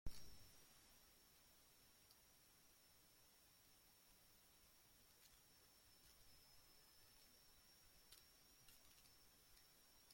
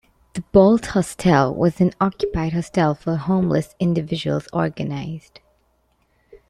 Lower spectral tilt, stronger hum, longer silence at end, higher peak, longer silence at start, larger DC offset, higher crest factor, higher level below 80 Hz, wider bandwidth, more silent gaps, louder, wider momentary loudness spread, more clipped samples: second, -2.5 dB/octave vs -7 dB/octave; neither; second, 0 s vs 0.15 s; second, -36 dBFS vs -2 dBFS; second, 0.05 s vs 0.35 s; neither; first, 26 dB vs 18 dB; second, -72 dBFS vs -44 dBFS; first, 16.5 kHz vs 13 kHz; neither; second, -68 LUFS vs -20 LUFS; second, 3 LU vs 12 LU; neither